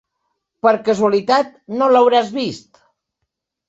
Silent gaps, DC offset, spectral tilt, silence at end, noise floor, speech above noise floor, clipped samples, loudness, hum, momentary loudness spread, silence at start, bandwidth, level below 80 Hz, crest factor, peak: none; under 0.1%; -5 dB/octave; 1.1 s; -77 dBFS; 61 dB; under 0.1%; -16 LUFS; none; 12 LU; 0.65 s; 8 kHz; -64 dBFS; 16 dB; -2 dBFS